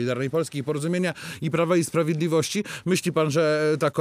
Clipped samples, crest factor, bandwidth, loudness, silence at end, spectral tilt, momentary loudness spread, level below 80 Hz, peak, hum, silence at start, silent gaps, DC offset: under 0.1%; 14 dB; 16 kHz; -24 LUFS; 0 s; -5.5 dB/octave; 6 LU; -66 dBFS; -10 dBFS; none; 0 s; none; under 0.1%